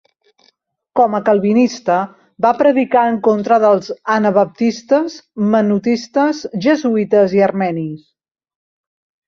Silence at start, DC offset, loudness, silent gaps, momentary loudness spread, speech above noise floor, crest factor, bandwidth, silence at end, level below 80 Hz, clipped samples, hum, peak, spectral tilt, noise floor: 0.95 s; under 0.1%; -15 LUFS; none; 7 LU; 46 dB; 14 dB; 7.2 kHz; 1.3 s; -62 dBFS; under 0.1%; none; -2 dBFS; -6.5 dB/octave; -60 dBFS